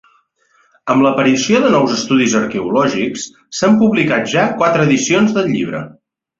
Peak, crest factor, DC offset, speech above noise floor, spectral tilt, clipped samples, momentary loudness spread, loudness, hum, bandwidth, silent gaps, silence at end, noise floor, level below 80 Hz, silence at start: 0 dBFS; 14 dB; under 0.1%; 43 dB; -4.5 dB/octave; under 0.1%; 11 LU; -14 LUFS; none; 7.8 kHz; none; 0.5 s; -57 dBFS; -54 dBFS; 0.85 s